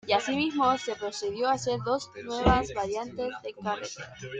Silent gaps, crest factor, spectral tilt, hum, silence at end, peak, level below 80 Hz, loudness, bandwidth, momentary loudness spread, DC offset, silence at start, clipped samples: none; 22 dB; -4.5 dB/octave; none; 0 s; -6 dBFS; -44 dBFS; -29 LUFS; 9.4 kHz; 10 LU; under 0.1%; 0.05 s; under 0.1%